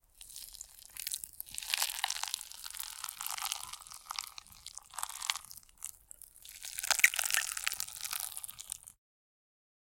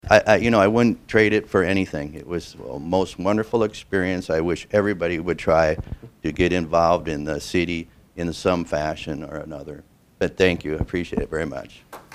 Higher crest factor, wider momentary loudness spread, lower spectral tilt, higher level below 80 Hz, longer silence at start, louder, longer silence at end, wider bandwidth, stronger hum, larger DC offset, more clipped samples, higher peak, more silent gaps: first, 30 dB vs 22 dB; first, 17 LU vs 14 LU; second, 3 dB/octave vs -6 dB/octave; second, -68 dBFS vs -44 dBFS; about the same, 0.15 s vs 0.05 s; second, -35 LUFS vs -22 LUFS; first, 1.05 s vs 0.15 s; first, 17 kHz vs 15 kHz; neither; neither; neither; second, -10 dBFS vs 0 dBFS; neither